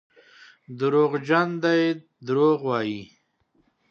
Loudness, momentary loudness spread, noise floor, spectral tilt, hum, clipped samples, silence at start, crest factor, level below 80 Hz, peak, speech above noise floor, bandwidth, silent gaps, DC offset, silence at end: -23 LUFS; 11 LU; -67 dBFS; -7 dB/octave; none; under 0.1%; 0.7 s; 18 dB; -74 dBFS; -6 dBFS; 45 dB; 7 kHz; none; under 0.1%; 0.85 s